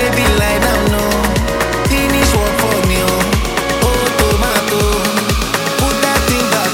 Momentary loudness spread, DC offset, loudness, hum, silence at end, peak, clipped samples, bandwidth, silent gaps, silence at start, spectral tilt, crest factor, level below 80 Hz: 3 LU; under 0.1%; -13 LUFS; none; 0 s; 0 dBFS; under 0.1%; 17 kHz; none; 0 s; -4 dB/octave; 14 dB; -22 dBFS